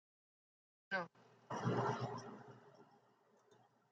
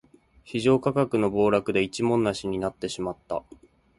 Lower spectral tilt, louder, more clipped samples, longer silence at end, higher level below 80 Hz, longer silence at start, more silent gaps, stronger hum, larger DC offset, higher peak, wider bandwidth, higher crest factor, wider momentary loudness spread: about the same, -6.5 dB/octave vs -6 dB/octave; second, -43 LUFS vs -25 LUFS; neither; first, 1.1 s vs 0.6 s; second, -84 dBFS vs -54 dBFS; first, 0.9 s vs 0.45 s; neither; neither; neither; second, -26 dBFS vs -8 dBFS; second, 7.8 kHz vs 11.5 kHz; about the same, 20 dB vs 18 dB; first, 19 LU vs 11 LU